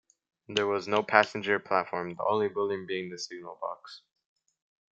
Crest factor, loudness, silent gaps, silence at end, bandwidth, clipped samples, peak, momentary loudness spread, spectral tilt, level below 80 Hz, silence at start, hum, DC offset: 28 dB; -29 LUFS; none; 0.95 s; 7.8 kHz; under 0.1%; -2 dBFS; 14 LU; -4 dB/octave; -78 dBFS; 0.5 s; none; under 0.1%